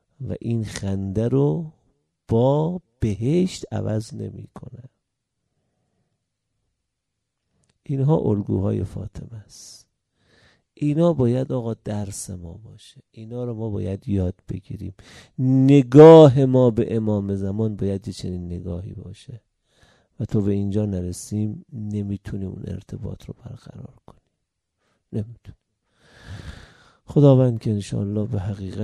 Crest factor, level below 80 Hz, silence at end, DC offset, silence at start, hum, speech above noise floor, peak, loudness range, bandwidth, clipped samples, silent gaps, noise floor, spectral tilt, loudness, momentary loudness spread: 22 dB; -50 dBFS; 0 s; under 0.1%; 0.2 s; none; 60 dB; 0 dBFS; 20 LU; 12 kHz; under 0.1%; none; -80 dBFS; -8 dB/octave; -20 LUFS; 23 LU